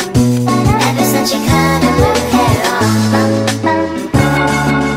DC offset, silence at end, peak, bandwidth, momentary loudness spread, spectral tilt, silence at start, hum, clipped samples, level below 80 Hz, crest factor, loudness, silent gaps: under 0.1%; 0 s; 0 dBFS; 16.5 kHz; 3 LU; -5 dB/octave; 0 s; none; under 0.1%; -30 dBFS; 12 dB; -12 LUFS; none